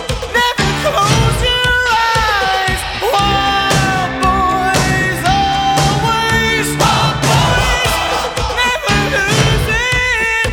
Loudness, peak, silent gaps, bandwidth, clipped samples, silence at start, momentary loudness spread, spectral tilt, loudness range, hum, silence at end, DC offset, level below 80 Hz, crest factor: -13 LUFS; 0 dBFS; none; 20 kHz; under 0.1%; 0 s; 3 LU; -3.5 dB/octave; 1 LU; none; 0 s; under 0.1%; -26 dBFS; 14 dB